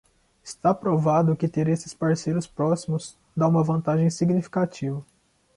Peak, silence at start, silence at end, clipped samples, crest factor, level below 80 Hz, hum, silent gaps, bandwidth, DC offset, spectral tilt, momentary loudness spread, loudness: -8 dBFS; 0.45 s; 0.55 s; under 0.1%; 16 dB; -60 dBFS; none; none; 11 kHz; under 0.1%; -7.5 dB/octave; 10 LU; -24 LUFS